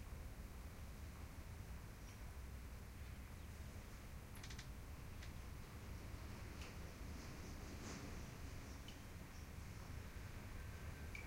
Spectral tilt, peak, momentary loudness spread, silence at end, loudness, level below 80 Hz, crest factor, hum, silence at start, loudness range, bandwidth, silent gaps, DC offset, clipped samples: -5 dB/octave; -40 dBFS; 3 LU; 0 s; -55 LUFS; -56 dBFS; 12 dB; none; 0 s; 2 LU; 16 kHz; none; under 0.1%; under 0.1%